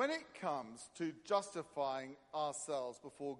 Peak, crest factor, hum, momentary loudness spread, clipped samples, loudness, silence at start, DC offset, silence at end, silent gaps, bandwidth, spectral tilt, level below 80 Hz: -22 dBFS; 20 dB; none; 8 LU; under 0.1%; -42 LUFS; 0 s; under 0.1%; 0 s; none; 11.5 kHz; -3.5 dB/octave; -84 dBFS